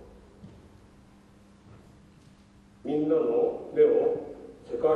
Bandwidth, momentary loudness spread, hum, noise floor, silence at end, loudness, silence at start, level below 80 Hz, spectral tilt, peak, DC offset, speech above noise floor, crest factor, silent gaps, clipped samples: 4.4 kHz; 19 LU; none; -56 dBFS; 0 s; -26 LUFS; 0 s; -62 dBFS; -8.5 dB/octave; -10 dBFS; under 0.1%; 31 dB; 18 dB; none; under 0.1%